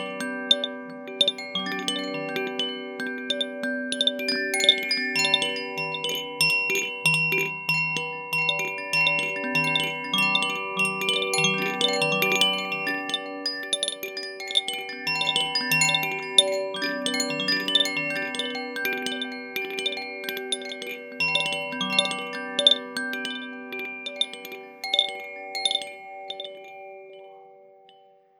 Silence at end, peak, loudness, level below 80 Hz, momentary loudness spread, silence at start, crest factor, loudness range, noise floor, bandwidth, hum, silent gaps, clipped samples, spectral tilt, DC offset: 0.7 s; -2 dBFS; -24 LUFS; -88 dBFS; 13 LU; 0 s; 26 dB; 6 LU; -56 dBFS; 18 kHz; none; none; under 0.1%; -2 dB/octave; under 0.1%